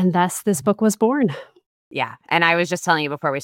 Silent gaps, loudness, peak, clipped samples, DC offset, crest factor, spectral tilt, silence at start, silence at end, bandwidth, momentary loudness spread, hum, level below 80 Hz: 1.66-1.91 s; -20 LUFS; -2 dBFS; under 0.1%; under 0.1%; 18 dB; -4.5 dB/octave; 0 s; 0 s; 17 kHz; 9 LU; none; -66 dBFS